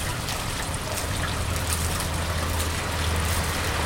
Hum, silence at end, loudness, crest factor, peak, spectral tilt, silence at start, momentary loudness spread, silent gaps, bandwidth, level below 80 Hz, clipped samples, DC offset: none; 0 s; -26 LUFS; 20 dB; -6 dBFS; -3.5 dB/octave; 0 s; 3 LU; none; 17 kHz; -34 dBFS; under 0.1%; under 0.1%